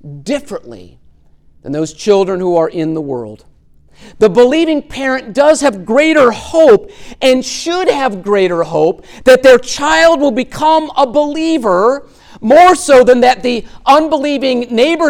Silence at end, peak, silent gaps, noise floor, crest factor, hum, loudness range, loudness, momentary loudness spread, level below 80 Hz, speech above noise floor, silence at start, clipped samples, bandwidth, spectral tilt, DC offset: 0 s; 0 dBFS; none; -45 dBFS; 12 dB; none; 7 LU; -11 LUFS; 13 LU; -42 dBFS; 34 dB; 0.05 s; under 0.1%; 15 kHz; -4 dB/octave; under 0.1%